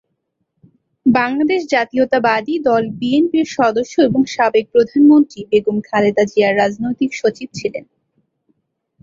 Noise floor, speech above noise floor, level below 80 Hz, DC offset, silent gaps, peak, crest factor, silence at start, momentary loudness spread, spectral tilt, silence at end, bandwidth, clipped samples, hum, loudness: -71 dBFS; 56 dB; -58 dBFS; under 0.1%; none; -2 dBFS; 14 dB; 1.05 s; 7 LU; -5.5 dB/octave; 1.2 s; 7.6 kHz; under 0.1%; none; -15 LUFS